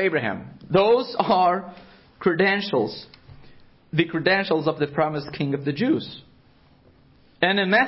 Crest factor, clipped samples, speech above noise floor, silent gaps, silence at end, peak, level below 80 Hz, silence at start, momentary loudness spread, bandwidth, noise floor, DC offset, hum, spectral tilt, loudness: 18 dB; under 0.1%; 33 dB; none; 0 s; -4 dBFS; -60 dBFS; 0 s; 10 LU; 5.8 kHz; -55 dBFS; under 0.1%; none; -10 dB/octave; -22 LUFS